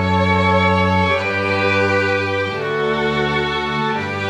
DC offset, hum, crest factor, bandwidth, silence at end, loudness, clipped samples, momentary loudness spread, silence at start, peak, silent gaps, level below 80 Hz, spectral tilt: under 0.1%; none; 14 dB; 10 kHz; 0 s; -17 LUFS; under 0.1%; 5 LU; 0 s; -2 dBFS; none; -44 dBFS; -6 dB/octave